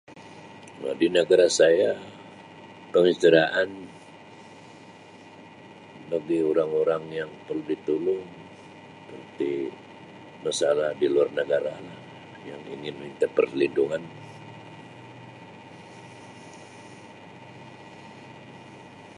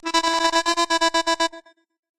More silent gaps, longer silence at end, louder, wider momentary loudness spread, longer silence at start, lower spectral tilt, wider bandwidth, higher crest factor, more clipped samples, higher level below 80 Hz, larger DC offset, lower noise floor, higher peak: neither; second, 0.1 s vs 0.6 s; second, -24 LUFS vs -20 LUFS; first, 26 LU vs 4 LU; about the same, 0.1 s vs 0.05 s; first, -4.5 dB/octave vs 0.5 dB/octave; second, 11.5 kHz vs 14 kHz; about the same, 22 dB vs 18 dB; neither; second, -70 dBFS vs -56 dBFS; neither; about the same, -48 dBFS vs -46 dBFS; about the same, -4 dBFS vs -4 dBFS